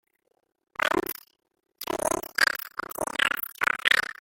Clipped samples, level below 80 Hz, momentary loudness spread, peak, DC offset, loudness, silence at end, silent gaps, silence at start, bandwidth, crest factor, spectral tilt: under 0.1%; -60 dBFS; 13 LU; -4 dBFS; under 0.1%; -26 LUFS; 0.1 s; none; 0.8 s; 17 kHz; 26 dB; -1 dB/octave